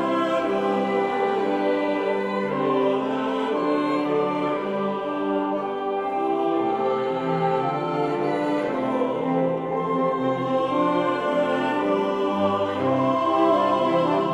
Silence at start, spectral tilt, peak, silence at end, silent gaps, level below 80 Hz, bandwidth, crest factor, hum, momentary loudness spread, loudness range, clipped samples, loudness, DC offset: 0 s; -7 dB/octave; -10 dBFS; 0 s; none; -64 dBFS; 10.5 kHz; 14 dB; none; 4 LU; 3 LU; under 0.1%; -23 LUFS; under 0.1%